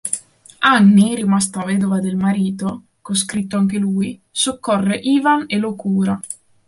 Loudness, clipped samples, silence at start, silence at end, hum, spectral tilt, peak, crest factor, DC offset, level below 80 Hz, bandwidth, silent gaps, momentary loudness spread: -17 LUFS; under 0.1%; 0.05 s; 0.35 s; none; -4.5 dB/octave; -2 dBFS; 16 dB; under 0.1%; -56 dBFS; 11.5 kHz; none; 12 LU